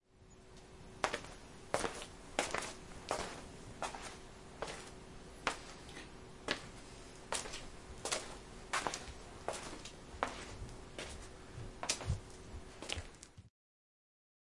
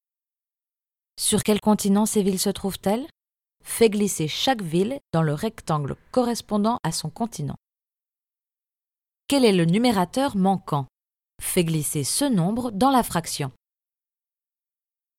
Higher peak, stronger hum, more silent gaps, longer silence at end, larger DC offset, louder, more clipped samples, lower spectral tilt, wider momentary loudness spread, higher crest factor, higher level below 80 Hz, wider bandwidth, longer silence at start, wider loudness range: second, -10 dBFS vs -6 dBFS; neither; neither; second, 1 s vs 1.7 s; neither; second, -44 LUFS vs -23 LUFS; neither; second, -2.5 dB/octave vs -5 dB/octave; first, 15 LU vs 10 LU; first, 34 dB vs 20 dB; about the same, -56 dBFS vs -54 dBFS; second, 11.5 kHz vs 16.5 kHz; second, 0.1 s vs 1.15 s; about the same, 3 LU vs 4 LU